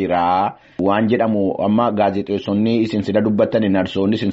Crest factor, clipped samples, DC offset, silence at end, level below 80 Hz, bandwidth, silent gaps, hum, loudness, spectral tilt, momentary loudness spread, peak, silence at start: 14 dB; under 0.1%; under 0.1%; 0 s; -54 dBFS; 7.8 kHz; none; none; -18 LUFS; -6 dB/octave; 3 LU; -4 dBFS; 0 s